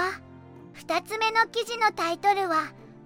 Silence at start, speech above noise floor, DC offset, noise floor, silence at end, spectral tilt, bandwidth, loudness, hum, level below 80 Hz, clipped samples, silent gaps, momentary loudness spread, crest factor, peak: 0 s; 21 dB; under 0.1%; -47 dBFS; 0 s; -2.5 dB/octave; 16.5 kHz; -25 LUFS; none; -68 dBFS; under 0.1%; none; 12 LU; 18 dB; -10 dBFS